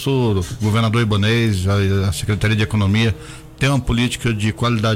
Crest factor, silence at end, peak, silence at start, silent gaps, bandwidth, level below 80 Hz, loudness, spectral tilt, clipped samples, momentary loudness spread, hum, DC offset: 12 dB; 0 s; -6 dBFS; 0 s; none; 15.5 kHz; -34 dBFS; -18 LUFS; -6 dB/octave; under 0.1%; 4 LU; none; under 0.1%